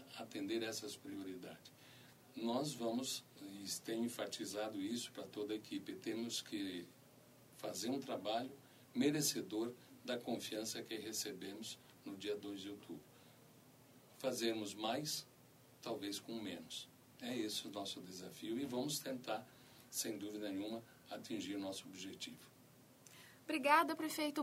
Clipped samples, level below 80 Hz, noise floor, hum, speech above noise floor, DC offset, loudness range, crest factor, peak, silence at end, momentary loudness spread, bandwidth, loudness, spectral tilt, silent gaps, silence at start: under 0.1%; -86 dBFS; -66 dBFS; none; 23 dB; under 0.1%; 5 LU; 26 dB; -18 dBFS; 0 s; 16 LU; 16 kHz; -43 LUFS; -3 dB/octave; none; 0 s